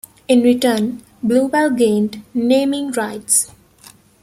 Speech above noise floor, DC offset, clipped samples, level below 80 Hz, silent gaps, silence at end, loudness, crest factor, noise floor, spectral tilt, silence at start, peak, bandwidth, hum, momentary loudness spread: 30 dB; under 0.1%; under 0.1%; -58 dBFS; none; 0.75 s; -16 LUFS; 16 dB; -46 dBFS; -3.5 dB/octave; 0.3 s; -2 dBFS; 15.5 kHz; none; 8 LU